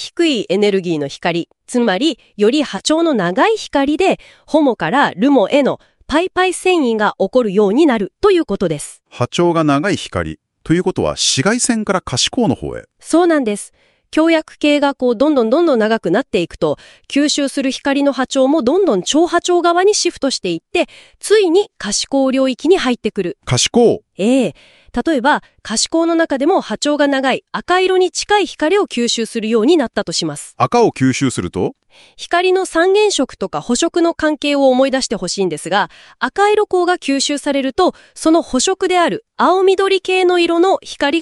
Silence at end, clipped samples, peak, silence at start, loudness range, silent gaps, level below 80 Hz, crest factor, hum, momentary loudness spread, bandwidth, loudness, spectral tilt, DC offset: 0 s; under 0.1%; 0 dBFS; 0 s; 2 LU; none; -48 dBFS; 14 dB; none; 8 LU; 12 kHz; -15 LUFS; -4 dB/octave; under 0.1%